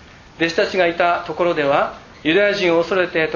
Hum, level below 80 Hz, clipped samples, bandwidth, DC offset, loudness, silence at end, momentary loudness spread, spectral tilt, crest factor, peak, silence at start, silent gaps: none; -52 dBFS; under 0.1%; 7.4 kHz; under 0.1%; -18 LUFS; 0 s; 5 LU; -5 dB/octave; 16 dB; -2 dBFS; 0.4 s; none